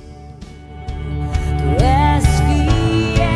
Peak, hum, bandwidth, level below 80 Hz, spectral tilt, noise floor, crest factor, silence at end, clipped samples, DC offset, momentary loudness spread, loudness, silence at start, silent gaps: -2 dBFS; none; 11 kHz; -20 dBFS; -6.5 dB/octave; -35 dBFS; 14 dB; 0 s; under 0.1%; under 0.1%; 23 LU; -16 LUFS; 0 s; none